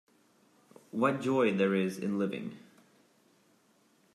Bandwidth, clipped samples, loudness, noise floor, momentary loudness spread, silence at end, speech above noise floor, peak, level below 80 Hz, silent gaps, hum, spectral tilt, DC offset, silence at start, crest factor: 13 kHz; under 0.1%; -31 LUFS; -68 dBFS; 15 LU; 1.55 s; 38 dB; -14 dBFS; -82 dBFS; none; none; -6.5 dB/octave; under 0.1%; 0.95 s; 20 dB